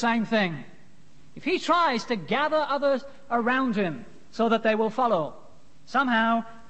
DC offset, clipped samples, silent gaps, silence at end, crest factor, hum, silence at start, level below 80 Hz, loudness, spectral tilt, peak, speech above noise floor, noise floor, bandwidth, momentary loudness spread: 0.8%; under 0.1%; none; 0.1 s; 16 dB; none; 0 s; -64 dBFS; -25 LUFS; -5.5 dB/octave; -10 dBFS; 32 dB; -56 dBFS; 8.6 kHz; 8 LU